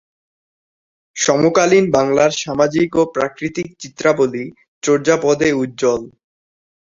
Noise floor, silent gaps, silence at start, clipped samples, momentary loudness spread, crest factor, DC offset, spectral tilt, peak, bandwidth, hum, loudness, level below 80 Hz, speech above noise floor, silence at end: under -90 dBFS; 4.68-4.81 s; 1.15 s; under 0.1%; 11 LU; 16 dB; under 0.1%; -4.5 dB/octave; 0 dBFS; 7.8 kHz; none; -16 LUFS; -54 dBFS; over 74 dB; 0.85 s